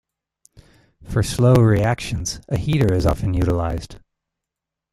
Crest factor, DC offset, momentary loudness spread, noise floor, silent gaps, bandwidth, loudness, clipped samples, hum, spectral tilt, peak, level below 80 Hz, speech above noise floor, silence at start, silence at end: 18 dB; under 0.1%; 12 LU; -85 dBFS; none; 15 kHz; -19 LUFS; under 0.1%; none; -6.5 dB/octave; -2 dBFS; -34 dBFS; 67 dB; 1 s; 0.95 s